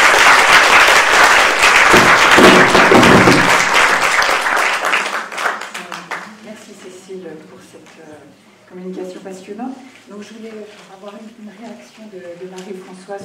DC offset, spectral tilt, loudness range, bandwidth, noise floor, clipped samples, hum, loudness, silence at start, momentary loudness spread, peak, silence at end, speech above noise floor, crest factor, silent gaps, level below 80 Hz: under 0.1%; -2.5 dB/octave; 25 LU; 16.5 kHz; -44 dBFS; 0.1%; none; -9 LUFS; 0 s; 25 LU; 0 dBFS; 0 s; 12 dB; 14 dB; none; -42 dBFS